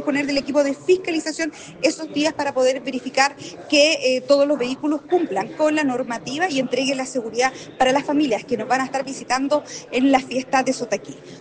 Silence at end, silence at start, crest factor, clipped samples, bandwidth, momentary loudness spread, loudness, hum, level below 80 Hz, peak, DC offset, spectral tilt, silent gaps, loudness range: 0 s; 0 s; 18 dB; under 0.1%; 9.8 kHz; 8 LU; -21 LUFS; none; -60 dBFS; -2 dBFS; under 0.1%; -3 dB/octave; none; 2 LU